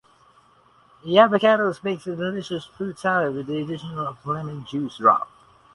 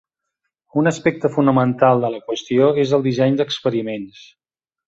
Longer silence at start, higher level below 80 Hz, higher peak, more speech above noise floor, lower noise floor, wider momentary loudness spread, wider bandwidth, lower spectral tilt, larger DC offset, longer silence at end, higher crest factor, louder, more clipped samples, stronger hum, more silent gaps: first, 1.05 s vs 0.75 s; about the same, -64 dBFS vs -60 dBFS; about the same, 0 dBFS vs -2 dBFS; second, 34 dB vs 60 dB; second, -57 dBFS vs -78 dBFS; first, 14 LU vs 10 LU; first, 11.5 kHz vs 7.8 kHz; about the same, -6.5 dB/octave vs -6.5 dB/octave; neither; second, 0.5 s vs 0.8 s; about the same, 22 dB vs 18 dB; second, -22 LUFS vs -18 LUFS; neither; neither; neither